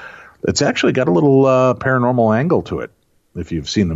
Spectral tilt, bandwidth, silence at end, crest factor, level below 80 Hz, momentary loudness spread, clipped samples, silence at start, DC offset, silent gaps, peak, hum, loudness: -6 dB/octave; 8 kHz; 0 s; 12 dB; -44 dBFS; 14 LU; under 0.1%; 0 s; under 0.1%; none; -4 dBFS; none; -15 LUFS